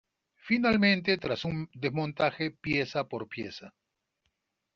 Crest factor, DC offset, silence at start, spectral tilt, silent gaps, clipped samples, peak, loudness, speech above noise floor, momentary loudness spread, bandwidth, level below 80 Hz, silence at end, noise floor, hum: 20 dB; under 0.1%; 0.45 s; -4 dB/octave; none; under 0.1%; -10 dBFS; -29 LUFS; 50 dB; 14 LU; 7 kHz; -60 dBFS; 1.05 s; -80 dBFS; none